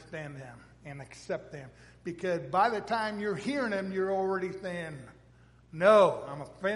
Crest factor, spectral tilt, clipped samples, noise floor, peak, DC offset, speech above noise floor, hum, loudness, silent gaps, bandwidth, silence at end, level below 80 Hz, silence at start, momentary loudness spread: 22 dB; -6 dB/octave; under 0.1%; -59 dBFS; -8 dBFS; under 0.1%; 28 dB; none; -29 LUFS; none; 11.5 kHz; 0 s; -64 dBFS; 0 s; 24 LU